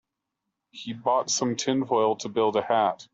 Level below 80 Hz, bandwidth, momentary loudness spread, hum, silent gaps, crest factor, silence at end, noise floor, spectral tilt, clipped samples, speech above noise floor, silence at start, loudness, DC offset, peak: -72 dBFS; 8.2 kHz; 6 LU; none; none; 16 dB; 0.1 s; -83 dBFS; -3.5 dB/octave; under 0.1%; 58 dB; 0.75 s; -25 LUFS; under 0.1%; -10 dBFS